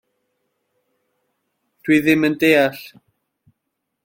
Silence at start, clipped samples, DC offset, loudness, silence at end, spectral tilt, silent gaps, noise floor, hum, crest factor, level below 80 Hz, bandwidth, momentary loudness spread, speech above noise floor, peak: 1.85 s; under 0.1%; under 0.1%; -16 LUFS; 1.15 s; -5.5 dB/octave; none; -77 dBFS; none; 20 dB; -60 dBFS; 16.5 kHz; 14 LU; 61 dB; -2 dBFS